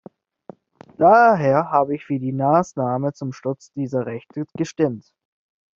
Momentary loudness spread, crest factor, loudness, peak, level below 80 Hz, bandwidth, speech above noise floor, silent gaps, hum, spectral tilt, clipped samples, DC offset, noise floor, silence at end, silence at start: 15 LU; 18 dB; -20 LUFS; -2 dBFS; -64 dBFS; 7.6 kHz; 26 dB; none; none; -7 dB/octave; under 0.1%; under 0.1%; -45 dBFS; 0.8 s; 1 s